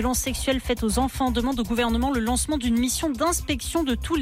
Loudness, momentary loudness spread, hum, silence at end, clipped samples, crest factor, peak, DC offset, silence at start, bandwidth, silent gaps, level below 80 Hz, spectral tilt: -24 LUFS; 2 LU; none; 0 s; under 0.1%; 12 dB; -12 dBFS; under 0.1%; 0 s; 16.5 kHz; none; -34 dBFS; -4 dB/octave